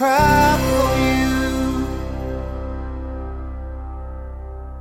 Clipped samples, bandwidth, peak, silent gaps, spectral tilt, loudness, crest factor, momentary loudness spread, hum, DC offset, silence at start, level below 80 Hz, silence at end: under 0.1%; 17 kHz; -2 dBFS; none; -5.5 dB/octave; -19 LUFS; 18 dB; 19 LU; 50 Hz at -65 dBFS; under 0.1%; 0 s; -28 dBFS; 0 s